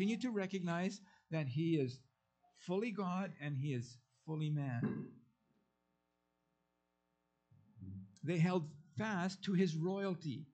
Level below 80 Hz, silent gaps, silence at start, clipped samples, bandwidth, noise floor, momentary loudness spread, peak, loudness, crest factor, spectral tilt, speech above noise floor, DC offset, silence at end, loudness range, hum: -84 dBFS; none; 0 s; under 0.1%; 8.6 kHz; -84 dBFS; 17 LU; -24 dBFS; -40 LUFS; 18 dB; -7 dB/octave; 46 dB; under 0.1%; 0.1 s; 9 LU; none